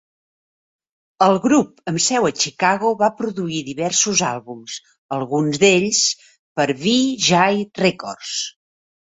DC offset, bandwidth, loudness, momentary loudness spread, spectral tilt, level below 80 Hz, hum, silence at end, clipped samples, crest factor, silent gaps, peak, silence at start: under 0.1%; 8.2 kHz; -18 LUFS; 15 LU; -3 dB/octave; -60 dBFS; none; 0.7 s; under 0.1%; 18 dB; 4.98-5.09 s, 6.39-6.56 s; -2 dBFS; 1.2 s